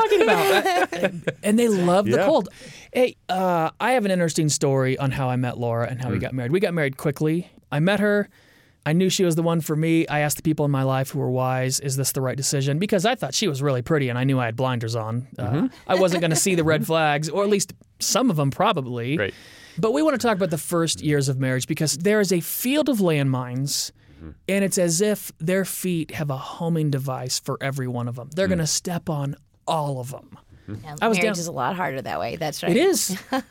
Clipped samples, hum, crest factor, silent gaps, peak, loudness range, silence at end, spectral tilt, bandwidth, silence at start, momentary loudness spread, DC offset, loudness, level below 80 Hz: under 0.1%; none; 16 dB; none; -6 dBFS; 4 LU; 0.05 s; -5 dB/octave; 17 kHz; 0 s; 8 LU; under 0.1%; -22 LUFS; -56 dBFS